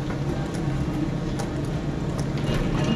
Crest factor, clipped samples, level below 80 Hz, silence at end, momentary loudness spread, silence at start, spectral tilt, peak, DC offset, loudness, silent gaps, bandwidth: 14 dB; under 0.1%; -34 dBFS; 0 s; 3 LU; 0 s; -7 dB/octave; -12 dBFS; under 0.1%; -27 LUFS; none; 13 kHz